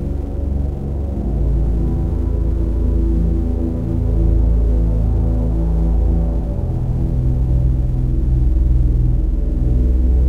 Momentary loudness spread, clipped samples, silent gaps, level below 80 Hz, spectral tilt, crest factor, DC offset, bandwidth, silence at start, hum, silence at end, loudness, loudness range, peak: 5 LU; under 0.1%; none; -16 dBFS; -11 dB/octave; 12 dB; 2%; 2 kHz; 0 s; none; 0 s; -19 LUFS; 2 LU; -4 dBFS